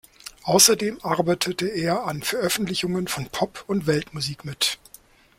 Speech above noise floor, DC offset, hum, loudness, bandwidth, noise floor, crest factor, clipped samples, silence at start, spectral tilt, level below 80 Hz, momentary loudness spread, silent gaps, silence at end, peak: 28 dB; under 0.1%; none; -22 LUFS; 16.5 kHz; -52 dBFS; 24 dB; under 0.1%; 0.25 s; -3 dB/octave; -56 dBFS; 13 LU; none; 0.65 s; 0 dBFS